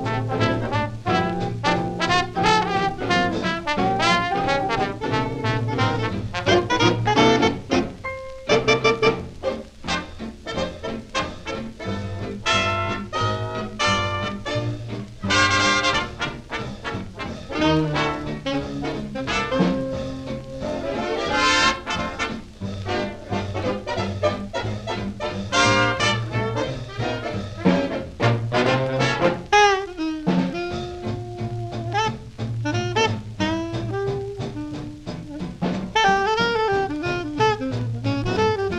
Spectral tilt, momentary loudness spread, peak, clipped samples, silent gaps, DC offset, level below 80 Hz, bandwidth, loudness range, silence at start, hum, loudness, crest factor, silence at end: -5 dB/octave; 12 LU; -6 dBFS; under 0.1%; none; under 0.1%; -42 dBFS; 11 kHz; 5 LU; 0 s; none; -23 LUFS; 18 dB; 0 s